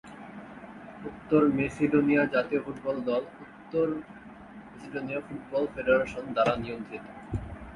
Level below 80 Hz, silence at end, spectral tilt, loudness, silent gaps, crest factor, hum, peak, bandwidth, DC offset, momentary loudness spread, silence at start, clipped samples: -52 dBFS; 0 s; -7.5 dB/octave; -28 LUFS; none; 20 dB; none; -10 dBFS; 11 kHz; under 0.1%; 21 LU; 0.05 s; under 0.1%